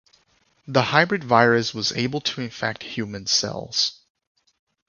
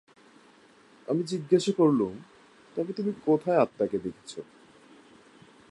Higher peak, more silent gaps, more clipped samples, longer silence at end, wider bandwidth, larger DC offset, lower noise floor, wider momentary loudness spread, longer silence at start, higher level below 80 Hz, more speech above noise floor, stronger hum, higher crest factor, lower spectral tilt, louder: first, 0 dBFS vs -8 dBFS; neither; neither; second, 0.95 s vs 1.25 s; second, 7.4 kHz vs 11.5 kHz; neither; first, -64 dBFS vs -57 dBFS; second, 10 LU vs 19 LU; second, 0.65 s vs 1.1 s; first, -60 dBFS vs -70 dBFS; first, 41 dB vs 31 dB; neither; about the same, 24 dB vs 20 dB; second, -3.5 dB/octave vs -6.5 dB/octave; first, -22 LUFS vs -27 LUFS